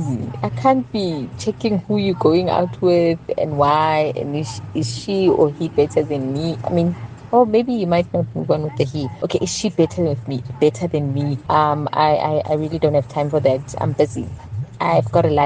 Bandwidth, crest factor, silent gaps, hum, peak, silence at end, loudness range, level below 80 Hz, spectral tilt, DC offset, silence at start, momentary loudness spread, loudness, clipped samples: 9.6 kHz; 16 dB; none; none; -2 dBFS; 0 s; 2 LU; -50 dBFS; -6.5 dB/octave; under 0.1%; 0 s; 8 LU; -19 LUFS; under 0.1%